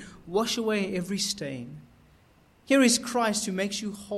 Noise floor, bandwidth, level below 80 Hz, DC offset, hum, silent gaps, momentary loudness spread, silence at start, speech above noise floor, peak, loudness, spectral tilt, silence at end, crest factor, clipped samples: -60 dBFS; 15 kHz; -62 dBFS; under 0.1%; none; none; 12 LU; 0 s; 33 dB; -8 dBFS; -26 LUFS; -3.5 dB/octave; 0 s; 20 dB; under 0.1%